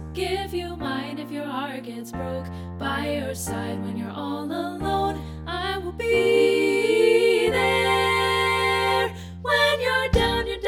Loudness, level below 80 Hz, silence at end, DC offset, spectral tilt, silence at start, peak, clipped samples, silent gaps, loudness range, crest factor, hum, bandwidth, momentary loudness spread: -23 LUFS; -40 dBFS; 0 s; under 0.1%; -4.5 dB/octave; 0 s; -8 dBFS; under 0.1%; none; 10 LU; 16 dB; none; 17.5 kHz; 13 LU